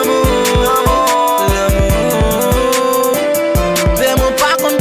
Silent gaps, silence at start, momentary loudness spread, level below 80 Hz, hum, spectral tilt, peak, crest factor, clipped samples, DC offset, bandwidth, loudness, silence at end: none; 0 s; 2 LU; -22 dBFS; none; -4.5 dB/octave; -2 dBFS; 10 dB; under 0.1%; under 0.1%; 16 kHz; -12 LUFS; 0 s